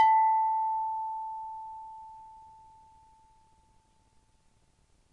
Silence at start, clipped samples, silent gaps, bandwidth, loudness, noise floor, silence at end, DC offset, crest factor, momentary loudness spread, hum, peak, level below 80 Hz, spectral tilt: 0 s; under 0.1%; none; 4.9 kHz; -29 LUFS; -67 dBFS; 2.65 s; under 0.1%; 18 dB; 26 LU; none; -14 dBFS; -70 dBFS; -2 dB/octave